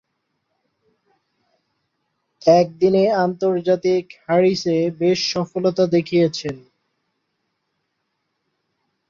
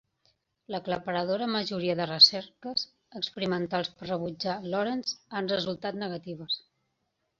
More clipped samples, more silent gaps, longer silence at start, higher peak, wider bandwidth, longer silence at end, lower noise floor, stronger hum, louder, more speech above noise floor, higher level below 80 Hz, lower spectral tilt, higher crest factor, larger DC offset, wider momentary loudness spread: neither; neither; first, 2.45 s vs 0.7 s; first, -2 dBFS vs -6 dBFS; about the same, 7.4 kHz vs 7.6 kHz; first, 2.5 s vs 0.8 s; second, -74 dBFS vs -79 dBFS; neither; first, -18 LUFS vs -28 LUFS; first, 56 dB vs 49 dB; first, -62 dBFS vs -68 dBFS; first, -6 dB/octave vs -4 dB/octave; second, 18 dB vs 24 dB; neither; second, 6 LU vs 17 LU